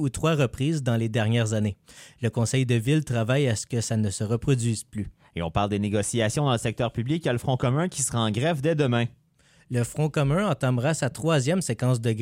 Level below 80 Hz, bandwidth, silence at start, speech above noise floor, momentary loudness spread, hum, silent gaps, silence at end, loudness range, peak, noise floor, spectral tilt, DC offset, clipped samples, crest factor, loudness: -50 dBFS; 16 kHz; 0 s; 36 dB; 6 LU; none; none; 0 s; 1 LU; -8 dBFS; -60 dBFS; -5.5 dB/octave; under 0.1%; under 0.1%; 16 dB; -25 LUFS